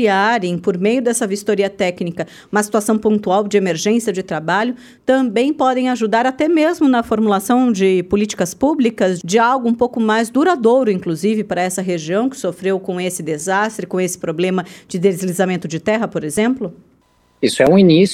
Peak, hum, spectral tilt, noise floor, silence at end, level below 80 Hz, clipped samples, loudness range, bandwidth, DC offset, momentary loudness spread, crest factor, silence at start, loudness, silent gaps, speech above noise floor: 0 dBFS; none; -5 dB/octave; -56 dBFS; 0 s; -54 dBFS; under 0.1%; 4 LU; 16 kHz; under 0.1%; 7 LU; 16 dB; 0 s; -16 LUFS; none; 40 dB